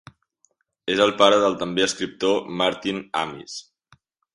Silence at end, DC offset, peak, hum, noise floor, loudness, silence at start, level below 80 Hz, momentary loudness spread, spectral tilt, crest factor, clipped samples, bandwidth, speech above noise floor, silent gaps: 0.75 s; under 0.1%; 0 dBFS; none; -67 dBFS; -21 LUFS; 0.85 s; -62 dBFS; 17 LU; -3.5 dB/octave; 22 dB; under 0.1%; 11.5 kHz; 45 dB; none